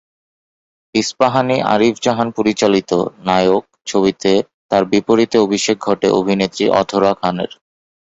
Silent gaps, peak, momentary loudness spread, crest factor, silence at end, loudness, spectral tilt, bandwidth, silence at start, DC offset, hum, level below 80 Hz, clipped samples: 4.54-4.69 s; -2 dBFS; 5 LU; 14 dB; 0.65 s; -16 LUFS; -5 dB/octave; 8.2 kHz; 0.95 s; under 0.1%; none; -52 dBFS; under 0.1%